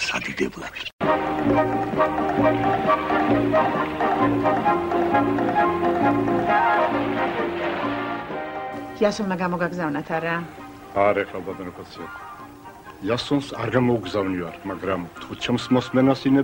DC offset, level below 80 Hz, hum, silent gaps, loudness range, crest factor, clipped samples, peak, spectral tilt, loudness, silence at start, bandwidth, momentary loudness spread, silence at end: under 0.1%; -50 dBFS; none; 0.93-0.99 s; 6 LU; 16 dB; under 0.1%; -6 dBFS; -6.5 dB/octave; -22 LUFS; 0 s; 16 kHz; 13 LU; 0 s